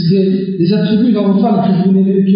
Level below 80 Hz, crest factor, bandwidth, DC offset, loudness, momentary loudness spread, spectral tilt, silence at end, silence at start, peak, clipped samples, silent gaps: -56 dBFS; 8 dB; 5.4 kHz; under 0.1%; -12 LUFS; 3 LU; -8 dB/octave; 0 s; 0 s; -2 dBFS; under 0.1%; none